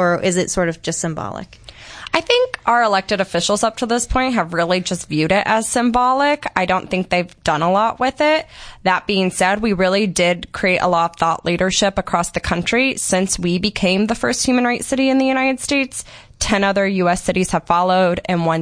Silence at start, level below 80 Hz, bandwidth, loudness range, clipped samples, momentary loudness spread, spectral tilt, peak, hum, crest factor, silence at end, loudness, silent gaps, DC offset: 0 s; -40 dBFS; 10.5 kHz; 1 LU; under 0.1%; 6 LU; -4 dB/octave; 0 dBFS; none; 18 dB; 0 s; -17 LUFS; none; under 0.1%